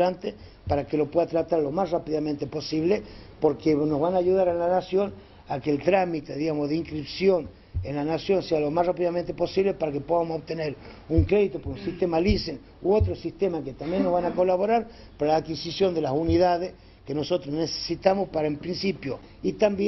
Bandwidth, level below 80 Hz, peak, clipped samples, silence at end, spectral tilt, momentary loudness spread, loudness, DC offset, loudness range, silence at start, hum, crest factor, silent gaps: 6.2 kHz; -44 dBFS; -4 dBFS; under 0.1%; 0 s; -7 dB/octave; 9 LU; -26 LUFS; under 0.1%; 2 LU; 0 s; none; 20 dB; none